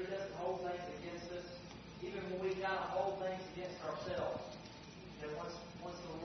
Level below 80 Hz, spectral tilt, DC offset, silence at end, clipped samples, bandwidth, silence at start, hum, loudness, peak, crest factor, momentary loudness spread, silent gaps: -66 dBFS; -4 dB/octave; under 0.1%; 0 s; under 0.1%; 6.2 kHz; 0 s; none; -44 LUFS; -26 dBFS; 18 dB; 12 LU; none